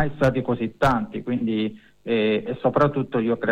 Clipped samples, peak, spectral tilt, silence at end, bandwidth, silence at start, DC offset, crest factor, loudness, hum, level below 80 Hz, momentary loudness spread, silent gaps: under 0.1%; -6 dBFS; -7.5 dB/octave; 0 s; 11 kHz; 0 s; under 0.1%; 16 dB; -23 LUFS; none; -44 dBFS; 6 LU; none